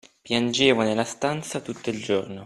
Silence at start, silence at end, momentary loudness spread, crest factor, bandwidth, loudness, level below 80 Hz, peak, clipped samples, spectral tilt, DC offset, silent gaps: 0.25 s; 0 s; 11 LU; 22 dB; 13 kHz; -24 LUFS; -62 dBFS; -2 dBFS; under 0.1%; -4 dB/octave; under 0.1%; none